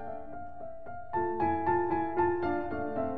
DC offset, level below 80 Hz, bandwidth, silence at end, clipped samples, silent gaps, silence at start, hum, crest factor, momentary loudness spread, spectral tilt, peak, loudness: 0.8%; -56 dBFS; 4.6 kHz; 0 s; under 0.1%; none; 0 s; none; 16 dB; 15 LU; -10 dB/octave; -16 dBFS; -31 LUFS